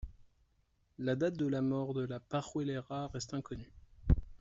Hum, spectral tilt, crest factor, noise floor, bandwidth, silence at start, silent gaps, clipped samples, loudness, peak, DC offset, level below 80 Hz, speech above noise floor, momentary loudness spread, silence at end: none; -7 dB/octave; 22 dB; -74 dBFS; 8 kHz; 0 s; none; under 0.1%; -37 LUFS; -14 dBFS; under 0.1%; -44 dBFS; 38 dB; 14 LU; 0.05 s